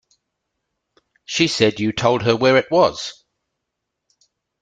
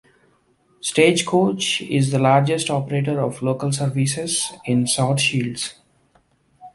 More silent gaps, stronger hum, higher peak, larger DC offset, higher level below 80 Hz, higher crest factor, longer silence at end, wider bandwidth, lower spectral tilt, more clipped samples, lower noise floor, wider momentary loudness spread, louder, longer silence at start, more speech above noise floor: neither; neither; about the same, -2 dBFS vs -2 dBFS; neither; about the same, -56 dBFS vs -60 dBFS; about the same, 20 dB vs 18 dB; first, 1.5 s vs 0.05 s; second, 9.4 kHz vs 12 kHz; about the same, -4.5 dB/octave vs -4.5 dB/octave; neither; first, -79 dBFS vs -60 dBFS; first, 11 LU vs 7 LU; first, -17 LUFS vs -20 LUFS; first, 1.3 s vs 0.85 s; first, 62 dB vs 41 dB